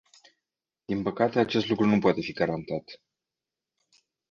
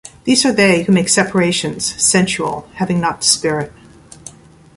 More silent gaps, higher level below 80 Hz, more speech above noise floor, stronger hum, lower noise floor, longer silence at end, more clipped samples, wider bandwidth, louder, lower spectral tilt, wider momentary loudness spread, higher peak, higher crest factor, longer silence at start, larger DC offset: neither; second, -62 dBFS vs -48 dBFS; first, 63 dB vs 24 dB; neither; first, -89 dBFS vs -39 dBFS; first, 1.35 s vs 0.45 s; neither; second, 7.2 kHz vs 11.5 kHz; second, -27 LUFS vs -14 LUFS; first, -7 dB/octave vs -3.5 dB/octave; about the same, 11 LU vs 10 LU; second, -8 dBFS vs 0 dBFS; about the same, 20 dB vs 16 dB; first, 0.9 s vs 0.05 s; neither